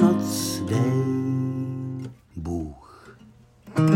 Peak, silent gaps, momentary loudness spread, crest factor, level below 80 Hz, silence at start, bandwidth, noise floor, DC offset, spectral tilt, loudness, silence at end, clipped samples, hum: -4 dBFS; none; 14 LU; 20 dB; -52 dBFS; 0 s; 16.5 kHz; -52 dBFS; under 0.1%; -6.5 dB/octave; -26 LUFS; 0 s; under 0.1%; none